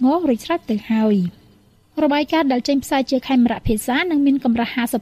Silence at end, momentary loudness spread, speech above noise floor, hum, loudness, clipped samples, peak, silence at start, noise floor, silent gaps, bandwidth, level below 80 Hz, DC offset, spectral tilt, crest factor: 0 s; 5 LU; 35 dB; none; -19 LUFS; under 0.1%; -6 dBFS; 0 s; -53 dBFS; none; 15.5 kHz; -40 dBFS; under 0.1%; -5.5 dB/octave; 12 dB